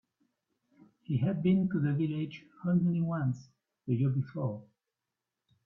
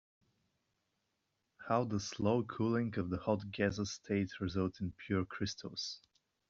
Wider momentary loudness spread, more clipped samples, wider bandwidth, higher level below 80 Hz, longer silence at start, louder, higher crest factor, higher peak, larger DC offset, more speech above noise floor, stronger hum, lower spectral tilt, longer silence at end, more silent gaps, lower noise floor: first, 11 LU vs 7 LU; neither; second, 6 kHz vs 7.4 kHz; about the same, -68 dBFS vs -66 dBFS; second, 1.1 s vs 1.6 s; first, -32 LUFS vs -37 LUFS; about the same, 16 dB vs 20 dB; about the same, -18 dBFS vs -18 dBFS; neither; first, 58 dB vs 48 dB; neither; first, -10 dB/octave vs -5.5 dB/octave; first, 1.05 s vs 0.5 s; neither; first, -88 dBFS vs -84 dBFS